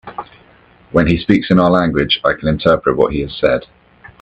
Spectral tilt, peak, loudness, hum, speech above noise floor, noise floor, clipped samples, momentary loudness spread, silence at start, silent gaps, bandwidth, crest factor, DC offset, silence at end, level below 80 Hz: -8 dB/octave; 0 dBFS; -14 LUFS; none; 33 dB; -47 dBFS; under 0.1%; 6 LU; 0.05 s; none; 8 kHz; 16 dB; under 0.1%; 0.6 s; -36 dBFS